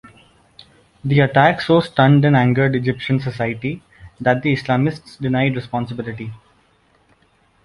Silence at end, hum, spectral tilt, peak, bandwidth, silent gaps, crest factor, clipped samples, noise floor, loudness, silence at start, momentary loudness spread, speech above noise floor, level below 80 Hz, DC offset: 1.3 s; none; -8 dB/octave; -2 dBFS; 11 kHz; none; 18 dB; under 0.1%; -58 dBFS; -17 LUFS; 1.05 s; 14 LU; 41 dB; -50 dBFS; under 0.1%